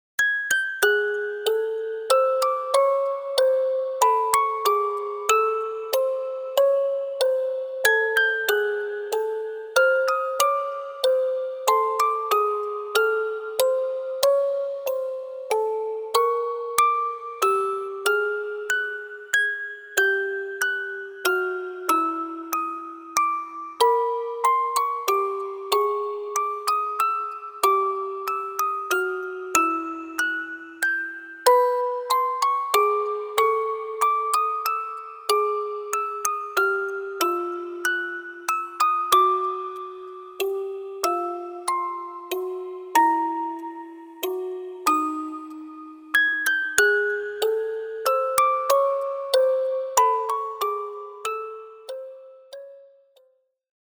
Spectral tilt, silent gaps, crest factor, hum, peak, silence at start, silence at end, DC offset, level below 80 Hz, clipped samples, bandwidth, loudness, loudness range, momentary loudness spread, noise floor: -0.5 dB/octave; none; 22 dB; none; -2 dBFS; 0.2 s; 1 s; under 0.1%; -72 dBFS; under 0.1%; over 20 kHz; -23 LUFS; 4 LU; 11 LU; -64 dBFS